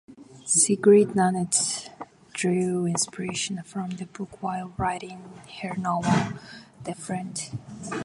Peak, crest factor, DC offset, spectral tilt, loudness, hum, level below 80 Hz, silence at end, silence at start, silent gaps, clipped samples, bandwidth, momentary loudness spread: -6 dBFS; 20 dB; under 0.1%; -4 dB/octave; -25 LUFS; none; -56 dBFS; 0 s; 0.1 s; none; under 0.1%; 11.5 kHz; 21 LU